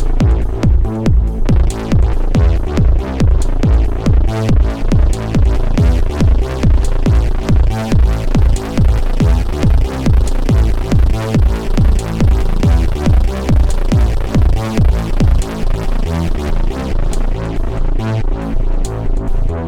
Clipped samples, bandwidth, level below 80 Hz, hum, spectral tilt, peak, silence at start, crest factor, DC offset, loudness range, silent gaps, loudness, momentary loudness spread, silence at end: under 0.1%; 11 kHz; -12 dBFS; none; -7.5 dB/octave; -2 dBFS; 0 s; 10 dB; under 0.1%; 4 LU; none; -15 LUFS; 6 LU; 0 s